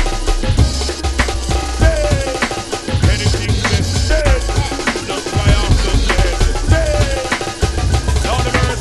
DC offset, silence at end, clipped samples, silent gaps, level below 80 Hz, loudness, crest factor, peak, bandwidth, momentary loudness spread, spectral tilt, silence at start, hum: under 0.1%; 0 s; under 0.1%; none; -18 dBFS; -16 LUFS; 14 dB; 0 dBFS; 12.5 kHz; 5 LU; -4.5 dB/octave; 0 s; none